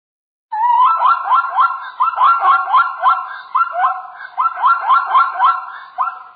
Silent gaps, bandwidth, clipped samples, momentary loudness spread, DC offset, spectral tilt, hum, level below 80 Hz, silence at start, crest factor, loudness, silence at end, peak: none; 4.8 kHz; under 0.1%; 10 LU; under 0.1%; 4 dB/octave; none; -68 dBFS; 0.5 s; 12 dB; -14 LUFS; 0.1 s; -2 dBFS